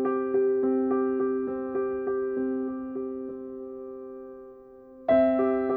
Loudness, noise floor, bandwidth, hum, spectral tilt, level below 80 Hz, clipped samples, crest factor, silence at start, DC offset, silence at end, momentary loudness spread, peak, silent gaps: -27 LUFS; -48 dBFS; 3.9 kHz; none; -10 dB/octave; -62 dBFS; under 0.1%; 16 dB; 0 s; under 0.1%; 0 s; 18 LU; -12 dBFS; none